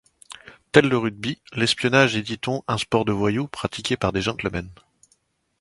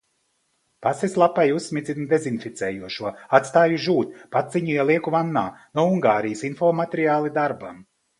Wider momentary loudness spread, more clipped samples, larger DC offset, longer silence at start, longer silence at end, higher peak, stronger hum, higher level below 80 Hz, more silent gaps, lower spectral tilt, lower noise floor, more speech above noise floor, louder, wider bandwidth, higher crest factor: first, 18 LU vs 10 LU; neither; neither; second, 0.3 s vs 0.8 s; first, 0.85 s vs 0.35 s; about the same, 0 dBFS vs 0 dBFS; neither; first, -50 dBFS vs -64 dBFS; neither; about the same, -5 dB/octave vs -6 dB/octave; second, -66 dBFS vs -70 dBFS; second, 44 dB vs 48 dB; about the same, -22 LUFS vs -22 LUFS; about the same, 11.5 kHz vs 11.5 kHz; about the same, 24 dB vs 22 dB